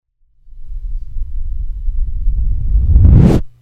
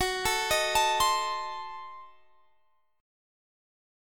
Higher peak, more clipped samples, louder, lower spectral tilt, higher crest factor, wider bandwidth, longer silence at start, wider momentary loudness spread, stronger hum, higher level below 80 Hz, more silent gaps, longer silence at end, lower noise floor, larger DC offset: first, 0 dBFS vs -14 dBFS; first, 0.4% vs under 0.1%; first, -14 LUFS vs -27 LUFS; first, -10 dB/octave vs -1 dB/octave; second, 12 dB vs 18 dB; second, 6.8 kHz vs 17.5 kHz; first, 0.55 s vs 0 s; first, 21 LU vs 17 LU; neither; first, -14 dBFS vs -54 dBFS; neither; second, 0.15 s vs 1 s; second, -40 dBFS vs -72 dBFS; neither